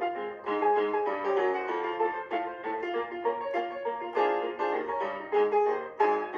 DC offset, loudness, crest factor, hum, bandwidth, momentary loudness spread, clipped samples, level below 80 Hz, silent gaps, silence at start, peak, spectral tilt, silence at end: under 0.1%; -30 LUFS; 16 dB; none; 6.8 kHz; 7 LU; under 0.1%; -74 dBFS; none; 0 s; -12 dBFS; -5.5 dB/octave; 0 s